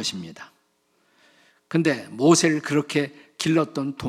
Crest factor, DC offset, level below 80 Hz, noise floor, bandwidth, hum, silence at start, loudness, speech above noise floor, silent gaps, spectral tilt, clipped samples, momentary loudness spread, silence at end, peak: 20 dB; under 0.1%; -70 dBFS; -67 dBFS; 14.5 kHz; none; 0 s; -22 LUFS; 45 dB; none; -4.5 dB/octave; under 0.1%; 13 LU; 0 s; -4 dBFS